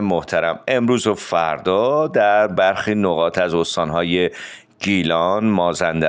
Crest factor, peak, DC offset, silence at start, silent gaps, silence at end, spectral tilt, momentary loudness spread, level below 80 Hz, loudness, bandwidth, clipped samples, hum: 14 dB; -4 dBFS; under 0.1%; 0 s; none; 0 s; -5 dB/octave; 5 LU; -52 dBFS; -18 LUFS; 9.6 kHz; under 0.1%; none